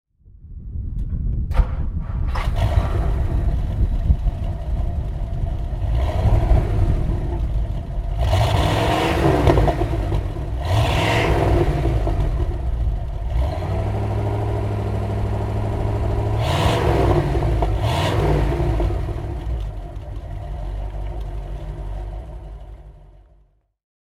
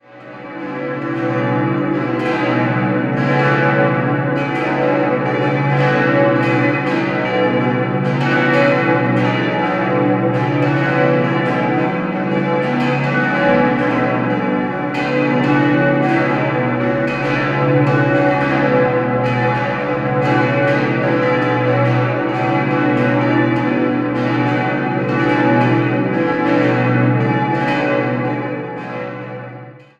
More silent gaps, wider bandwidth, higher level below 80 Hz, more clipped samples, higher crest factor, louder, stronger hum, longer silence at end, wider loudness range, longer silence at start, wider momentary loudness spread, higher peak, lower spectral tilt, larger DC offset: neither; first, 13.5 kHz vs 7.8 kHz; first, -24 dBFS vs -50 dBFS; neither; first, 20 dB vs 14 dB; second, -22 LUFS vs -16 LUFS; neither; first, 1 s vs 0.2 s; first, 10 LU vs 1 LU; first, 0.25 s vs 0.1 s; first, 14 LU vs 5 LU; about the same, 0 dBFS vs -2 dBFS; about the same, -7 dB/octave vs -8 dB/octave; neither